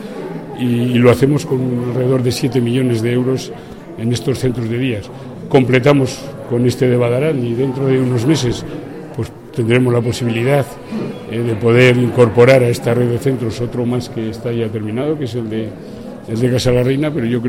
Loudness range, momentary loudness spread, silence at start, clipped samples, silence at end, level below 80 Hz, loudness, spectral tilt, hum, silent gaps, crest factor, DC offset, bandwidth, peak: 5 LU; 15 LU; 0 s; under 0.1%; 0 s; -42 dBFS; -15 LUFS; -7 dB/octave; none; none; 14 dB; 0.3%; 16 kHz; 0 dBFS